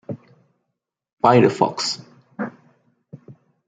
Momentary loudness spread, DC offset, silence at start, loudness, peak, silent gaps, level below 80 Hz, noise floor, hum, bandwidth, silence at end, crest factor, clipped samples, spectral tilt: 21 LU; under 0.1%; 0.1 s; -20 LUFS; -2 dBFS; 1.13-1.17 s; -64 dBFS; -80 dBFS; none; 9.4 kHz; 0.35 s; 20 dB; under 0.1%; -5.5 dB/octave